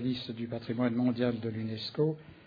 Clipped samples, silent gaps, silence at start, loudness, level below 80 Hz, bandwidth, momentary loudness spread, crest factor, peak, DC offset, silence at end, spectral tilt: under 0.1%; none; 0 s; -33 LUFS; -68 dBFS; 5 kHz; 7 LU; 16 dB; -16 dBFS; under 0.1%; 0.1 s; -8.5 dB/octave